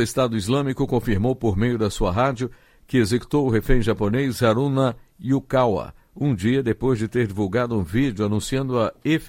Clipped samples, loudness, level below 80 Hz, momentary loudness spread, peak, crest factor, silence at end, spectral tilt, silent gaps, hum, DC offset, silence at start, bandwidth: under 0.1%; -22 LUFS; -36 dBFS; 4 LU; -4 dBFS; 18 dB; 0 s; -6.5 dB/octave; none; none; under 0.1%; 0 s; 16.5 kHz